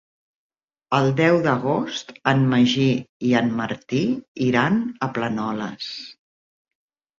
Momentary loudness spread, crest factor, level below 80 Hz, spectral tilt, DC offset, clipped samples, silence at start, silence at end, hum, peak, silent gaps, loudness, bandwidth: 11 LU; 20 dB; -60 dBFS; -6.5 dB/octave; under 0.1%; under 0.1%; 0.9 s; 1.05 s; none; -2 dBFS; 3.09-3.20 s, 4.28-4.35 s; -21 LUFS; 7.4 kHz